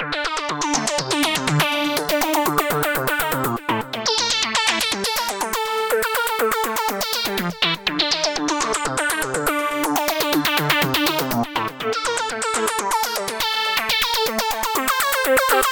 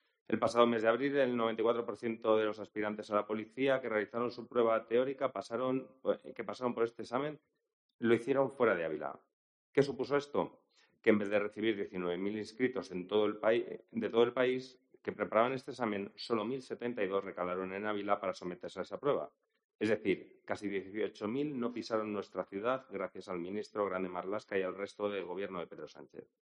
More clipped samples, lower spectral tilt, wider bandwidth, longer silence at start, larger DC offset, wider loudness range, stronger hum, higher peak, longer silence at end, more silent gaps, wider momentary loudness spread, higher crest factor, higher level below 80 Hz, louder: neither; second, -2.5 dB/octave vs -6 dB/octave; first, over 20 kHz vs 10 kHz; second, 0 s vs 0.3 s; neither; second, 1 LU vs 4 LU; neither; first, -4 dBFS vs -12 dBFS; second, 0 s vs 0.25 s; second, none vs 7.73-7.99 s, 9.33-9.73 s, 19.64-19.69 s, 19.75-19.79 s; second, 5 LU vs 11 LU; about the same, 18 dB vs 22 dB; first, -48 dBFS vs -78 dBFS; first, -20 LUFS vs -35 LUFS